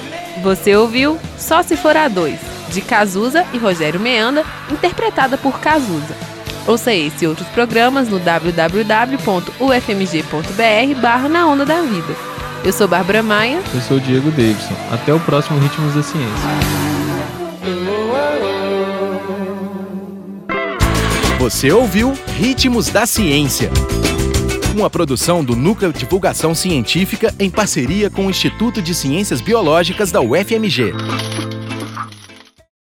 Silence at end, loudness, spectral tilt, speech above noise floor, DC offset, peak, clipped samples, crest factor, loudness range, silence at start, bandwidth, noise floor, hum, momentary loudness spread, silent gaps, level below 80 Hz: 0.55 s; -15 LUFS; -4.5 dB/octave; 27 dB; under 0.1%; 0 dBFS; under 0.1%; 16 dB; 4 LU; 0 s; 17 kHz; -41 dBFS; none; 10 LU; none; -32 dBFS